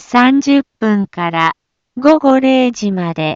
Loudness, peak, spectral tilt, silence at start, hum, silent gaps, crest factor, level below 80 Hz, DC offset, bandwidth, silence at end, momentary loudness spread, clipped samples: -13 LUFS; 0 dBFS; -6 dB/octave; 0.1 s; none; none; 12 dB; -56 dBFS; under 0.1%; 7.6 kHz; 0 s; 8 LU; under 0.1%